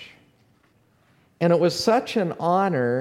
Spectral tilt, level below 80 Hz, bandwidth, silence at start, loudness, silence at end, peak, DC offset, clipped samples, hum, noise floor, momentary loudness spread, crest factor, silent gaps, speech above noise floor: -6 dB/octave; -66 dBFS; 15.5 kHz; 0 s; -22 LUFS; 0 s; -6 dBFS; under 0.1%; under 0.1%; none; -61 dBFS; 5 LU; 18 dB; none; 41 dB